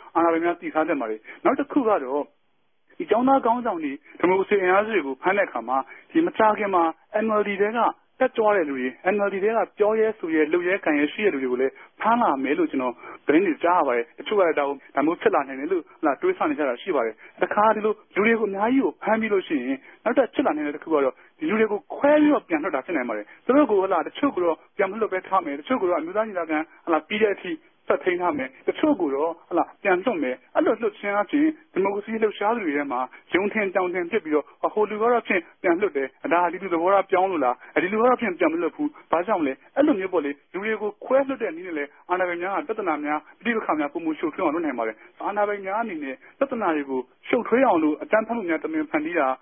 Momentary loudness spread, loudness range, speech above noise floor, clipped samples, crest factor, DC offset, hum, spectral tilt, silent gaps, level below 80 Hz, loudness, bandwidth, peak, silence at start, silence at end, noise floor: 7 LU; 3 LU; 49 dB; under 0.1%; 20 dB; under 0.1%; none; -10 dB/octave; none; -68 dBFS; -24 LUFS; 3.6 kHz; -4 dBFS; 0 s; 0.05 s; -72 dBFS